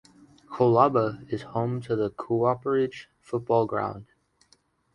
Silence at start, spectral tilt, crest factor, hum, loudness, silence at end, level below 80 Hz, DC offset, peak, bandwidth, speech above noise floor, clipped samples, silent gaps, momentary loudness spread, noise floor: 0.5 s; -8.5 dB/octave; 22 dB; none; -26 LUFS; 0.9 s; -62 dBFS; under 0.1%; -6 dBFS; 10.5 kHz; 40 dB; under 0.1%; none; 13 LU; -65 dBFS